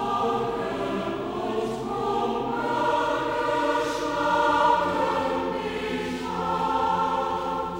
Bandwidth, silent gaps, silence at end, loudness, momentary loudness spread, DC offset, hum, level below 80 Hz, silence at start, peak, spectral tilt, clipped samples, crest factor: 20 kHz; none; 0 s; -25 LUFS; 7 LU; under 0.1%; none; -52 dBFS; 0 s; -10 dBFS; -5 dB/octave; under 0.1%; 16 dB